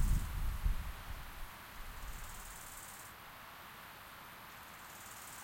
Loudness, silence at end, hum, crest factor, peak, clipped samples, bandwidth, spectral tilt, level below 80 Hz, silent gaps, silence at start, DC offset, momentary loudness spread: -47 LUFS; 0 s; none; 20 dB; -22 dBFS; under 0.1%; 16.5 kHz; -4 dB/octave; -44 dBFS; none; 0 s; under 0.1%; 11 LU